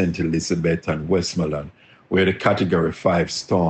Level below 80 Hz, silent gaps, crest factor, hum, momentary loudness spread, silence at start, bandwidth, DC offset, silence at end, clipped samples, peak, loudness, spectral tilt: -46 dBFS; none; 16 dB; none; 6 LU; 0 s; 8.6 kHz; under 0.1%; 0 s; under 0.1%; -4 dBFS; -21 LUFS; -5.5 dB/octave